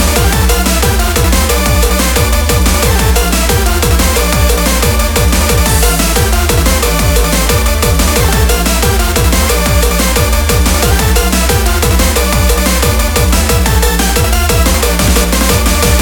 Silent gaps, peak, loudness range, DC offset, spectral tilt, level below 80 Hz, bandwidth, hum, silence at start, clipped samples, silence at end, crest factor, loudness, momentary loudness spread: none; 0 dBFS; 0 LU; under 0.1%; -4 dB/octave; -12 dBFS; over 20 kHz; none; 0 s; under 0.1%; 0 s; 10 dB; -10 LUFS; 1 LU